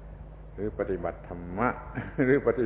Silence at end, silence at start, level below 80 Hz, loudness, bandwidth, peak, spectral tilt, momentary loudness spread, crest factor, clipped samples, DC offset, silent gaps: 0 s; 0 s; -44 dBFS; -30 LUFS; 4 kHz; -10 dBFS; -11.5 dB/octave; 20 LU; 20 dB; under 0.1%; under 0.1%; none